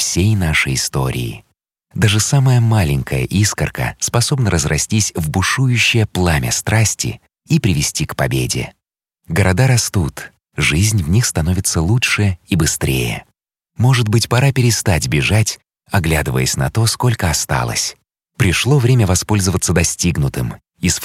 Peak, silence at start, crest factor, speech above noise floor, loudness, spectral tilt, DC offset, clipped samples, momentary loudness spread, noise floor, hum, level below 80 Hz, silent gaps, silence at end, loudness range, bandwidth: 0 dBFS; 0 s; 16 dB; 52 dB; -16 LUFS; -4.5 dB/octave; under 0.1%; under 0.1%; 8 LU; -68 dBFS; none; -32 dBFS; none; 0 s; 2 LU; 16 kHz